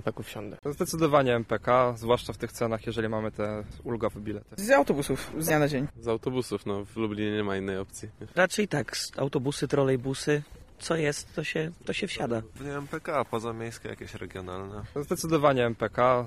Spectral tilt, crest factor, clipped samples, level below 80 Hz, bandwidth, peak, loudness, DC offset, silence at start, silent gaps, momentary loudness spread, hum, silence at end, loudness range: -5 dB/octave; 20 dB; under 0.1%; -52 dBFS; 15.5 kHz; -8 dBFS; -29 LUFS; under 0.1%; 0 s; none; 14 LU; none; 0 s; 5 LU